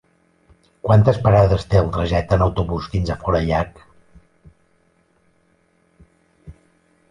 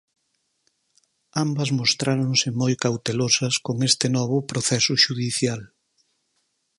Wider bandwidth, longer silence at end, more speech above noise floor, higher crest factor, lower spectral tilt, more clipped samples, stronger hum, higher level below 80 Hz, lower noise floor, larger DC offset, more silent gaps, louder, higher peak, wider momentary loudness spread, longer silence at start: second, 9.8 kHz vs 11.5 kHz; second, 0.6 s vs 1.15 s; second, 44 dB vs 50 dB; about the same, 18 dB vs 22 dB; first, -8 dB/octave vs -3.5 dB/octave; neither; neither; first, -34 dBFS vs -62 dBFS; second, -61 dBFS vs -73 dBFS; neither; neither; first, -18 LUFS vs -21 LUFS; about the same, -2 dBFS vs -2 dBFS; first, 9 LU vs 6 LU; second, 0.85 s vs 1.35 s